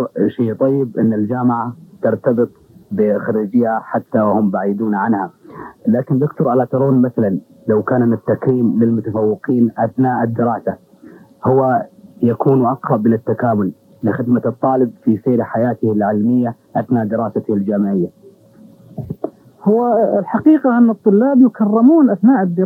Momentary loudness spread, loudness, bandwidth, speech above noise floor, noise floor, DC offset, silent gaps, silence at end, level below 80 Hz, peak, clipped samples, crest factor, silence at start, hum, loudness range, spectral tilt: 10 LU; -16 LUFS; 3.4 kHz; 29 dB; -44 dBFS; under 0.1%; none; 0 s; -64 dBFS; 0 dBFS; under 0.1%; 14 dB; 0 s; none; 3 LU; -11.5 dB/octave